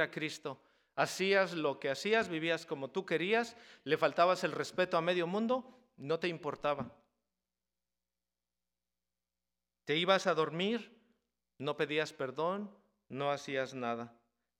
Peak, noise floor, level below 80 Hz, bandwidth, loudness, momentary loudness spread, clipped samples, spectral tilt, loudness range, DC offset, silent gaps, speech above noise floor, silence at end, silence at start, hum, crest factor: -14 dBFS; under -90 dBFS; -80 dBFS; 16.5 kHz; -34 LUFS; 14 LU; under 0.1%; -4.5 dB/octave; 8 LU; under 0.1%; none; over 56 dB; 0.5 s; 0 s; 60 Hz at -70 dBFS; 22 dB